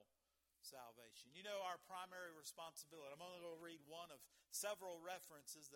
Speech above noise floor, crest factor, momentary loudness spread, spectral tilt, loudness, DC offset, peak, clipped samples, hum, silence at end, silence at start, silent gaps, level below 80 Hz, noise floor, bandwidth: 32 dB; 22 dB; 12 LU; -1.5 dB/octave; -54 LUFS; under 0.1%; -34 dBFS; under 0.1%; none; 0 s; 0 s; none; under -90 dBFS; -87 dBFS; 18 kHz